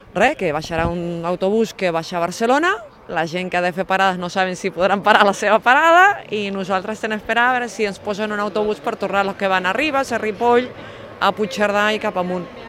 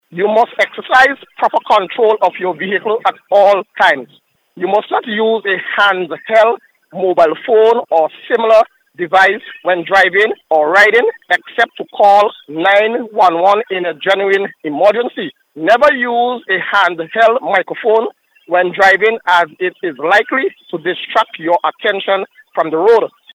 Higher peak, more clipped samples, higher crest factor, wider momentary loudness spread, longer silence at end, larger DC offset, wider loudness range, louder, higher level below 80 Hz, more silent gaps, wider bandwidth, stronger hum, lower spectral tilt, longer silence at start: about the same, 0 dBFS vs 0 dBFS; neither; first, 18 dB vs 12 dB; about the same, 10 LU vs 9 LU; second, 0 s vs 0.25 s; neither; about the same, 5 LU vs 3 LU; second, -18 LUFS vs -13 LUFS; first, -48 dBFS vs -60 dBFS; neither; about the same, 16 kHz vs 15 kHz; neither; about the same, -4.5 dB/octave vs -4 dB/octave; about the same, 0.05 s vs 0.1 s